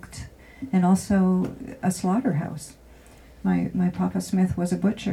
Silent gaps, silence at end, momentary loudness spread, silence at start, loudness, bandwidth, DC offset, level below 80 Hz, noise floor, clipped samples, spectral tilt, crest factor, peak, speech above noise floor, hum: none; 0 s; 19 LU; 0.05 s; -24 LUFS; 13 kHz; under 0.1%; -50 dBFS; -49 dBFS; under 0.1%; -7 dB/octave; 16 dB; -10 dBFS; 25 dB; none